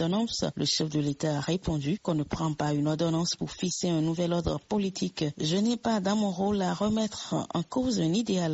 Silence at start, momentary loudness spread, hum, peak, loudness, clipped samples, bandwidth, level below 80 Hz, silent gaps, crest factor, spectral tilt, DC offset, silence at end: 0 s; 4 LU; none; -14 dBFS; -29 LUFS; under 0.1%; 8 kHz; -52 dBFS; none; 14 dB; -5.5 dB/octave; under 0.1%; 0 s